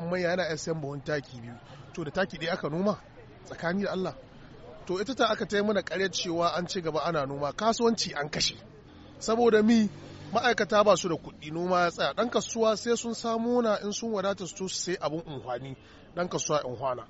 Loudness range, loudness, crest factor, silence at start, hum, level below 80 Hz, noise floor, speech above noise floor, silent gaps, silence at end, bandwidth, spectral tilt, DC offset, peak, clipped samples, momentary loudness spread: 7 LU; -29 LUFS; 20 dB; 0 s; none; -58 dBFS; -50 dBFS; 21 dB; none; 0.05 s; 8 kHz; -3.5 dB/octave; under 0.1%; -8 dBFS; under 0.1%; 14 LU